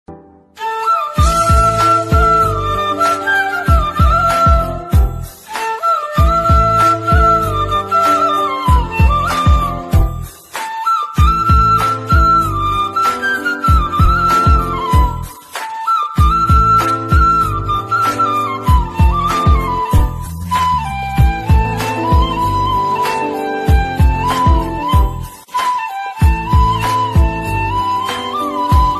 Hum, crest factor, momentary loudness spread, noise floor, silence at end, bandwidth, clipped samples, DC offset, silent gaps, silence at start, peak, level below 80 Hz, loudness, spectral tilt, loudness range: none; 12 dB; 8 LU; -38 dBFS; 0 s; 13.5 kHz; under 0.1%; under 0.1%; none; 0.1 s; -2 dBFS; -18 dBFS; -14 LUFS; -6 dB/octave; 3 LU